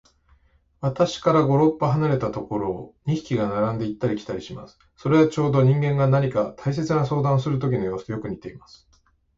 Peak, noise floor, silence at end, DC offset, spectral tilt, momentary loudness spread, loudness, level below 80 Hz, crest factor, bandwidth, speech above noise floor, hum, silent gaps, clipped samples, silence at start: -6 dBFS; -62 dBFS; 0.8 s; under 0.1%; -8 dB/octave; 12 LU; -23 LUFS; -52 dBFS; 16 dB; 7.6 kHz; 40 dB; none; none; under 0.1%; 0.8 s